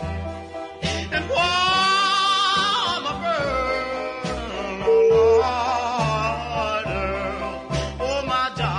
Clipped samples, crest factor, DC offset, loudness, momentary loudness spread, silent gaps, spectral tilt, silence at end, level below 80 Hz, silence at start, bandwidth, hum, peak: under 0.1%; 14 dB; under 0.1%; -21 LUFS; 11 LU; none; -4 dB/octave; 0 s; -40 dBFS; 0 s; 11 kHz; none; -8 dBFS